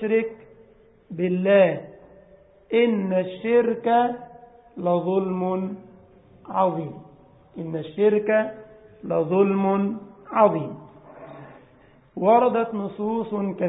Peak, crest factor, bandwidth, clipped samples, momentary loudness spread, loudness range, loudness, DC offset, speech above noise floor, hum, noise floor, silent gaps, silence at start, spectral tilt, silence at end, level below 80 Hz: -4 dBFS; 20 dB; 4 kHz; under 0.1%; 22 LU; 4 LU; -23 LUFS; under 0.1%; 33 dB; none; -54 dBFS; none; 0 s; -11.5 dB/octave; 0 s; -64 dBFS